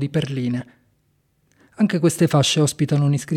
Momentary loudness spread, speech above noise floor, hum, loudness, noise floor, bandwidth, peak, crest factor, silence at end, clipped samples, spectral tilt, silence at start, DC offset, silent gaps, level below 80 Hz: 8 LU; 46 dB; none; -20 LUFS; -65 dBFS; 15.5 kHz; -4 dBFS; 16 dB; 0 s; under 0.1%; -5.5 dB/octave; 0 s; under 0.1%; none; -58 dBFS